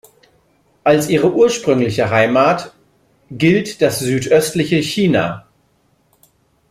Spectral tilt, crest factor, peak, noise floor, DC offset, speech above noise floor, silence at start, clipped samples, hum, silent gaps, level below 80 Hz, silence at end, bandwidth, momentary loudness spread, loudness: -5.5 dB/octave; 16 dB; 0 dBFS; -59 dBFS; under 0.1%; 45 dB; 0.85 s; under 0.1%; none; none; -52 dBFS; 1.3 s; 16 kHz; 8 LU; -15 LUFS